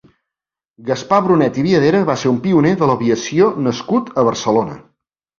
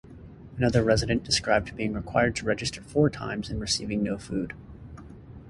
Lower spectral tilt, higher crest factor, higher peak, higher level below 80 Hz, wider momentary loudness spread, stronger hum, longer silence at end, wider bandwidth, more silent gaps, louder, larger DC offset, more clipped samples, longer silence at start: first, -6.5 dB/octave vs -4.5 dB/octave; second, 14 dB vs 20 dB; first, -2 dBFS vs -8 dBFS; second, -52 dBFS vs -44 dBFS; second, 7 LU vs 22 LU; neither; first, 0.6 s vs 0 s; second, 7.4 kHz vs 11.5 kHz; neither; first, -15 LUFS vs -26 LUFS; neither; neither; first, 0.8 s vs 0.05 s